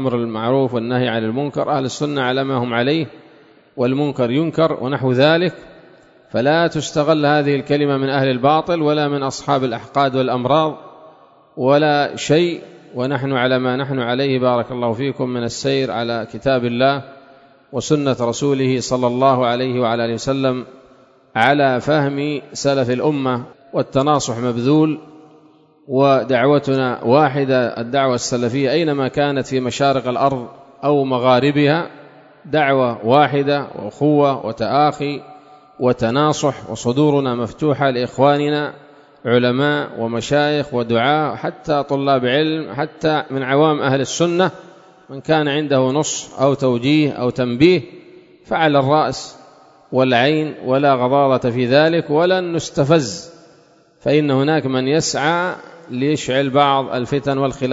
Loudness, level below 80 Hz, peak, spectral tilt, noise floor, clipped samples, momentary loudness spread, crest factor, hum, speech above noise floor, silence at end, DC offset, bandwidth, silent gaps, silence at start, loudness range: -17 LUFS; -54 dBFS; 0 dBFS; -5.5 dB/octave; -51 dBFS; under 0.1%; 8 LU; 18 dB; none; 34 dB; 0 s; under 0.1%; 8 kHz; none; 0 s; 3 LU